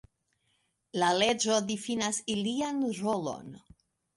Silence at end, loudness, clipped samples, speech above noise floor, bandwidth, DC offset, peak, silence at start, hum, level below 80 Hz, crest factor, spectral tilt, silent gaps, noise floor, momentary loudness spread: 0.6 s; -30 LUFS; under 0.1%; 46 dB; 11.5 kHz; under 0.1%; -12 dBFS; 0.95 s; none; -68 dBFS; 20 dB; -3 dB/octave; none; -75 dBFS; 13 LU